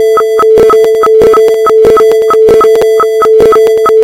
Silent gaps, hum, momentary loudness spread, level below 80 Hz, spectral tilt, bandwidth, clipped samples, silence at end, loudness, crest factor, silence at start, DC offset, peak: none; none; 2 LU; -36 dBFS; -4.5 dB/octave; 16 kHz; 4%; 0 s; -5 LUFS; 4 dB; 0 s; 0.3%; 0 dBFS